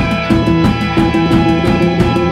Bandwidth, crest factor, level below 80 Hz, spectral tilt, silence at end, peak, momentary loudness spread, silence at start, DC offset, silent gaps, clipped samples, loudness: 12.5 kHz; 12 dB; -26 dBFS; -7 dB/octave; 0 s; 0 dBFS; 2 LU; 0 s; under 0.1%; none; under 0.1%; -12 LUFS